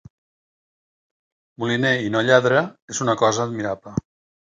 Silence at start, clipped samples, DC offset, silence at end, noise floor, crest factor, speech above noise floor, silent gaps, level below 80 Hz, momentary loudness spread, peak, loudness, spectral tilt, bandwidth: 1.6 s; under 0.1%; under 0.1%; 0.5 s; under -90 dBFS; 22 dB; over 70 dB; 2.82-2.88 s; -58 dBFS; 13 LU; -2 dBFS; -21 LUFS; -4.5 dB/octave; 9.6 kHz